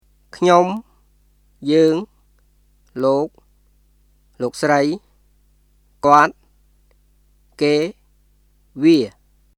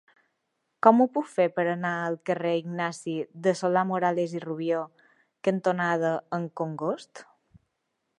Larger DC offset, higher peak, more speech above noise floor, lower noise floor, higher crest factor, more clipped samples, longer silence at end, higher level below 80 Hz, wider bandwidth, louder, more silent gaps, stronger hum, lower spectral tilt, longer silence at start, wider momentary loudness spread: neither; first, 0 dBFS vs -4 dBFS; second, 41 dB vs 53 dB; second, -57 dBFS vs -79 dBFS; about the same, 20 dB vs 24 dB; neither; second, 0.5 s vs 0.95 s; first, -56 dBFS vs -78 dBFS; first, 13 kHz vs 11 kHz; first, -17 LUFS vs -27 LUFS; neither; first, 50 Hz at -55 dBFS vs none; about the same, -5.5 dB/octave vs -6.5 dB/octave; second, 0.35 s vs 0.85 s; first, 16 LU vs 10 LU